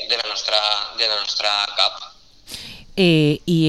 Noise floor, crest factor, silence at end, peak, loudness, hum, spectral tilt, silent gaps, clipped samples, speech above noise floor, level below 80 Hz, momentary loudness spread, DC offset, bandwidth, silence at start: -39 dBFS; 20 dB; 0 s; 0 dBFS; -18 LUFS; none; -4.5 dB/octave; none; under 0.1%; 20 dB; -52 dBFS; 18 LU; 0.2%; 13 kHz; 0 s